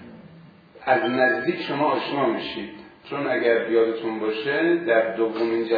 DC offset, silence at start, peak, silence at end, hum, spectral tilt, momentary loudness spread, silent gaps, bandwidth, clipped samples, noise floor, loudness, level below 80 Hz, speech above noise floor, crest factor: under 0.1%; 0 s; -4 dBFS; 0 s; none; -7.5 dB/octave; 12 LU; none; 5 kHz; under 0.1%; -48 dBFS; -23 LUFS; -66 dBFS; 26 dB; 18 dB